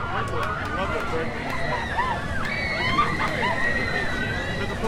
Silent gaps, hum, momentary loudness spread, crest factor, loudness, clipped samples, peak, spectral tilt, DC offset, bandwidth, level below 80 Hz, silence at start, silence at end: none; none; 5 LU; 16 dB; -25 LUFS; under 0.1%; -8 dBFS; -5 dB/octave; under 0.1%; 16 kHz; -38 dBFS; 0 s; 0 s